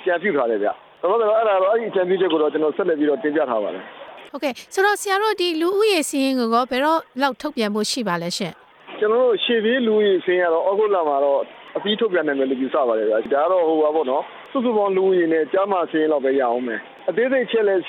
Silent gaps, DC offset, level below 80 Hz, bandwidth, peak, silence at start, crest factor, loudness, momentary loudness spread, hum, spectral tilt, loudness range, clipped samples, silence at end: none; under 0.1%; -70 dBFS; 17 kHz; -6 dBFS; 0 s; 14 dB; -20 LUFS; 8 LU; none; -4 dB/octave; 2 LU; under 0.1%; 0 s